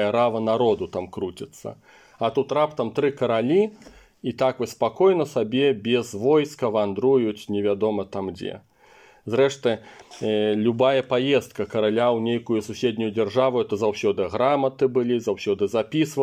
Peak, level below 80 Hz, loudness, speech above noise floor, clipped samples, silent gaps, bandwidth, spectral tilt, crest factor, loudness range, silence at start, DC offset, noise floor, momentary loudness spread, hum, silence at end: -8 dBFS; -64 dBFS; -23 LUFS; 30 dB; under 0.1%; none; 14.5 kHz; -6 dB/octave; 16 dB; 3 LU; 0 s; under 0.1%; -53 dBFS; 11 LU; none; 0 s